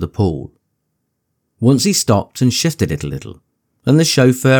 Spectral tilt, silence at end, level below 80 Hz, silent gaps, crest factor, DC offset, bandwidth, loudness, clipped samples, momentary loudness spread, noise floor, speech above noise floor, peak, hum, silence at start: -5 dB/octave; 0 s; -42 dBFS; none; 14 dB; under 0.1%; 19 kHz; -15 LUFS; under 0.1%; 14 LU; -71 dBFS; 57 dB; 0 dBFS; none; 0 s